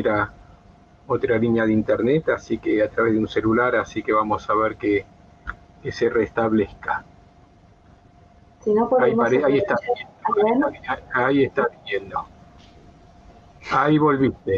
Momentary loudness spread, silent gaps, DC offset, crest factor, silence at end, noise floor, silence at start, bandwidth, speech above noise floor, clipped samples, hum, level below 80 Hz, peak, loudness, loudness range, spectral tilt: 12 LU; none; under 0.1%; 16 dB; 0 s; -52 dBFS; 0 s; 7.2 kHz; 31 dB; under 0.1%; none; -50 dBFS; -6 dBFS; -21 LUFS; 5 LU; -7.5 dB/octave